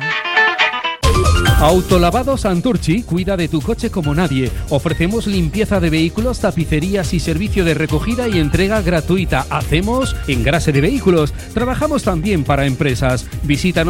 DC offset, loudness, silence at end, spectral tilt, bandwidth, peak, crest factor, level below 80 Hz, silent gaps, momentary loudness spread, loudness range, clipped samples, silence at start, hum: under 0.1%; -16 LUFS; 0 s; -5.5 dB/octave; 17 kHz; 0 dBFS; 14 dB; -24 dBFS; none; 5 LU; 2 LU; under 0.1%; 0 s; none